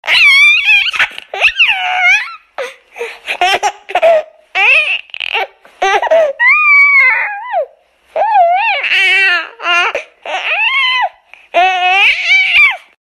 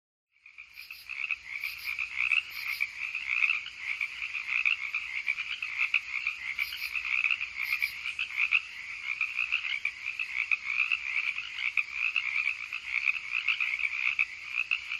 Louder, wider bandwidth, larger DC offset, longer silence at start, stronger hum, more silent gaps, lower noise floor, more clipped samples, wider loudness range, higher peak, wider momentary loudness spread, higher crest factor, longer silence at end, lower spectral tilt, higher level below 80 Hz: first, -9 LUFS vs -29 LUFS; about the same, 15.5 kHz vs 15.5 kHz; neither; second, 0.05 s vs 0.45 s; neither; neither; second, -45 dBFS vs -52 dBFS; neither; first, 4 LU vs 1 LU; first, 0 dBFS vs -12 dBFS; first, 16 LU vs 7 LU; second, 12 dB vs 20 dB; first, 0.3 s vs 0 s; about the same, 0.5 dB/octave vs 1.5 dB/octave; first, -54 dBFS vs -70 dBFS